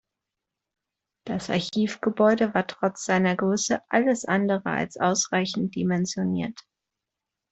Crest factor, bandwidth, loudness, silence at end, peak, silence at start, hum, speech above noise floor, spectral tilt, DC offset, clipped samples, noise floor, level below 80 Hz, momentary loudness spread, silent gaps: 20 dB; 8.2 kHz; -25 LUFS; 0.9 s; -6 dBFS; 1.25 s; none; 62 dB; -4.5 dB/octave; under 0.1%; under 0.1%; -86 dBFS; -64 dBFS; 6 LU; none